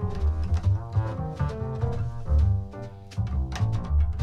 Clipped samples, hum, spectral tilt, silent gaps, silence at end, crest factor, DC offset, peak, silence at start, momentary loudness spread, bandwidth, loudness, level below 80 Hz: under 0.1%; none; -8 dB/octave; none; 0 s; 12 dB; under 0.1%; -12 dBFS; 0 s; 8 LU; 7 kHz; -28 LUFS; -30 dBFS